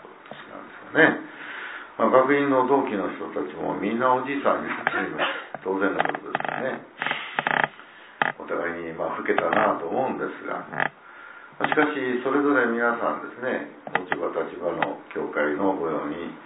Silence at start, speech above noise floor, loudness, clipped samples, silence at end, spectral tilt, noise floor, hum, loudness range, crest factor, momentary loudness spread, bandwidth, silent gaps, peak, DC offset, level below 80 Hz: 0 s; 22 dB; -25 LUFS; under 0.1%; 0 s; -9 dB/octave; -46 dBFS; none; 4 LU; 22 dB; 12 LU; 4 kHz; none; -2 dBFS; under 0.1%; -68 dBFS